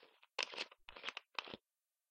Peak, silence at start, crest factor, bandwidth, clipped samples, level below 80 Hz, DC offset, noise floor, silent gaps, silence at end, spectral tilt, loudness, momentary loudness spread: -18 dBFS; 0 s; 32 dB; 16 kHz; under 0.1%; -80 dBFS; under 0.1%; under -90 dBFS; none; 0.55 s; -0.5 dB/octave; -46 LUFS; 9 LU